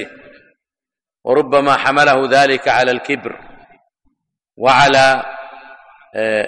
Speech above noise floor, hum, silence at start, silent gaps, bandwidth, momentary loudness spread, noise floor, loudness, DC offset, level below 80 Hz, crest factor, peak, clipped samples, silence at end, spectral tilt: 76 dB; none; 0 s; none; 11.5 kHz; 19 LU; -89 dBFS; -13 LUFS; under 0.1%; -50 dBFS; 14 dB; -2 dBFS; under 0.1%; 0 s; -4 dB/octave